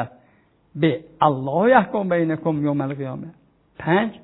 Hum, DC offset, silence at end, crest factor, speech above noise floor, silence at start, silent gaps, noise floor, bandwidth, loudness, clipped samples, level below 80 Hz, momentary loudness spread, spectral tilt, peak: none; under 0.1%; 0.05 s; 20 dB; 38 dB; 0 s; none; -58 dBFS; 4.1 kHz; -21 LUFS; under 0.1%; -60 dBFS; 16 LU; -11 dB/octave; -2 dBFS